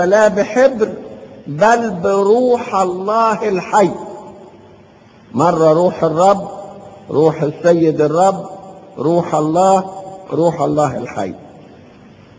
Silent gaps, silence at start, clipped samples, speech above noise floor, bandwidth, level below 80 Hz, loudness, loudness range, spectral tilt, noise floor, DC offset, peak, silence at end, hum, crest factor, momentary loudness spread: none; 0 s; under 0.1%; 30 dB; 8 kHz; -52 dBFS; -14 LUFS; 3 LU; -6.5 dB/octave; -44 dBFS; under 0.1%; 0 dBFS; 0.8 s; none; 16 dB; 19 LU